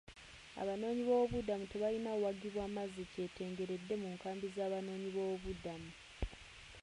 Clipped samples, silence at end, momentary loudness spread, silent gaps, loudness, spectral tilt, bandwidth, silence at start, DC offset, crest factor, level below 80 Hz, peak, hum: under 0.1%; 0 s; 14 LU; none; -41 LUFS; -6 dB/octave; 11 kHz; 0.05 s; under 0.1%; 18 dB; -58 dBFS; -24 dBFS; none